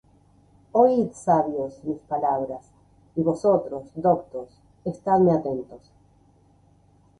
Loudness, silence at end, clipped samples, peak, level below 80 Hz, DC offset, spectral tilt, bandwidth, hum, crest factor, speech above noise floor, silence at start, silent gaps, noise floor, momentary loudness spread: -24 LUFS; 1.4 s; under 0.1%; -6 dBFS; -60 dBFS; under 0.1%; -8.5 dB/octave; 11 kHz; none; 20 dB; 35 dB; 0.75 s; none; -58 dBFS; 15 LU